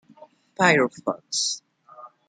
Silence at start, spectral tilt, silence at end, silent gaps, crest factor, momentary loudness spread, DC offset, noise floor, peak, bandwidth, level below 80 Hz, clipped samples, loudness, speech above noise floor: 0.6 s; -3 dB/octave; 0.2 s; none; 22 dB; 12 LU; under 0.1%; -52 dBFS; -4 dBFS; 9.6 kHz; -72 dBFS; under 0.1%; -23 LUFS; 29 dB